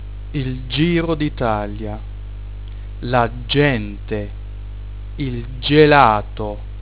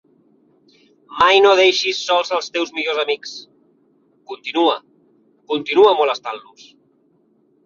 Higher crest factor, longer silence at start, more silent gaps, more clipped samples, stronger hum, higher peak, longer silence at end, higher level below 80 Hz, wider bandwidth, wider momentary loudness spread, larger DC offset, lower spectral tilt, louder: about the same, 20 dB vs 18 dB; second, 0 s vs 1.1 s; neither; neither; first, 50 Hz at -30 dBFS vs none; about the same, 0 dBFS vs -2 dBFS; second, 0 s vs 1.25 s; first, -30 dBFS vs -62 dBFS; second, 4 kHz vs 7.4 kHz; about the same, 21 LU vs 20 LU; first, 1% vs under 0.1%; first, -10.5 dB/octave vs -2 dB/octave; about the same, -18 LUFS vs -16 LUFS